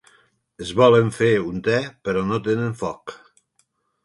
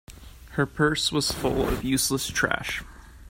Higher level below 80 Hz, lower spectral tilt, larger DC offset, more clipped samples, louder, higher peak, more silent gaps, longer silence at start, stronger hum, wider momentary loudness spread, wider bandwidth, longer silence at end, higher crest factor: second, -54 dBFS vs -42 dBFS; first, -6.5 dB/octave vs -3.5 dB/octave; neither; neither; first, -20 LUFS vs -25 LUFS; about the same, -4 dBFS vs -6 dBFS; neither; first, 0.6 s vs 0.1 s; neither; first, 16 LU vs 7 LU; second, 11.5 kHz vs 16.5 kHz; first, 0.9 s vs 0 s; about the same, 18 dB vs 20 dB